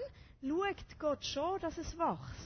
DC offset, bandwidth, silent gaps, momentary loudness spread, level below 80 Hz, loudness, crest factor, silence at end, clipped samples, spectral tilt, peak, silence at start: under 0.1%; 6.6 kHz; none; 6 LU; -56 dBFS; -38 LUFS; 16 dB; 0 s; under 0.1%; -4.5 dB/octave; -22 dBFS; 0 s